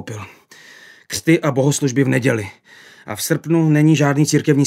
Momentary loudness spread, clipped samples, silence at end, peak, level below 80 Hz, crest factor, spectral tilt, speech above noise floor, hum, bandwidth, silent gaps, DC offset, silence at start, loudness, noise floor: 18 LU; under 0.1%; 0 s; -2 dBFS; -62 dBFS; 16 dB; -5.5 dB/octave; 27 dB; none; 16 kHz; none; under 0.1%; 0 s; -16 LUFS; -44 dBFS